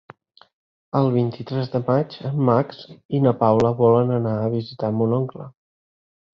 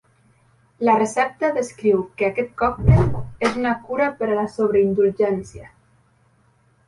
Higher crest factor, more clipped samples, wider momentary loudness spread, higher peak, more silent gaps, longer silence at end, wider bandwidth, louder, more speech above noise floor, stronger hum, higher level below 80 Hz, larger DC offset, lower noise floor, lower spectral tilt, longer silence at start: about the same, 18 dB vs 18 dB; neither; first, 11 LU vs 7 LU; about the same, -2 dBFS vs -2 dBFS; first, 3.05-3.09 s vs none; second, 0.85 s vs 1.2 s; second, 7 kHz vs 11.5 kHz; about the same, -21 LUFS vs -20 LUFS; first, over 70 dB vs 40 dB; neither; second, -56 dBFS vs -36 dBFS; neither; first, under -90 dBFS vs -59 dBFS; first, -9.5 dB/octave vs -7.5 dB/octave; first, 0.95 s vs 0.8 s